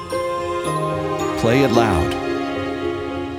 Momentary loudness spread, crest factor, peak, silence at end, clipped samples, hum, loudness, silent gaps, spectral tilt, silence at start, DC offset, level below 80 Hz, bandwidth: 9 LU; 20 dB; 0 dBFS; 0 s; under 0.1%; none; -20 LUFS; none; -6 dB/octave; 0 s; under 0.1%; -42 dBFS; 16.5 kHz